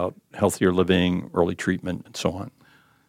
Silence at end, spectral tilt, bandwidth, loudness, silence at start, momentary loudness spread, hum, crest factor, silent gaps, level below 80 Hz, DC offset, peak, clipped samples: 0.6 s; -5.5 dB/octave; 16 kHz; -24 LUFS; 0 s; 11 LU; none; 18 dB; none; -52 dBFS; under 0.1%; -6 dBFS; under 0.1%